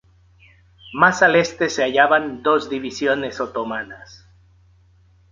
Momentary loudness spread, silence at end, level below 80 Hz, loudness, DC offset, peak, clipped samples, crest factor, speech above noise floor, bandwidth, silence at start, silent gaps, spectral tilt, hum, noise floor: 14 LU; 1.15 s; -56 dBFS; -18 LUFS; under 0.1%; -2 dBFS; under 0.1%; 20 dB; 35 dB; 7.6 kHz; 0.85 s; none; -4 dB/octave; none; -54 dBFS